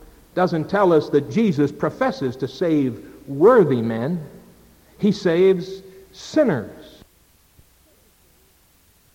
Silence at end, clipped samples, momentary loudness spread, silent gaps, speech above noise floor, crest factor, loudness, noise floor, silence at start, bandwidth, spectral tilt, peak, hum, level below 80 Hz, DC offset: 2.25 s; under 0.1%; 17 LU; none; 38 dB; 18 dB; -20 LUFS; -57 dBFS; 0.35 s; 16.5 kHz; -7.5 dB/octave; -4 dBFS; none; -56 dBFS; under 0.1%